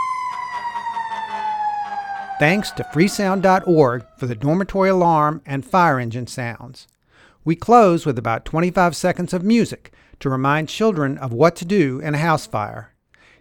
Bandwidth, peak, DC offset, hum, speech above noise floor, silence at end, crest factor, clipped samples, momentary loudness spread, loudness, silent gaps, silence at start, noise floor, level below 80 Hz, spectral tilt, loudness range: 18 kHz; 0 dBFS; under 0.1%; none; 36 dB; 0.55 s; 18 dB; under 0.1%; 12 LU; -19 LUFS; none; 0 s; -54 dBFS; -48 dBFS; -6.5 dB/octave; 2 LU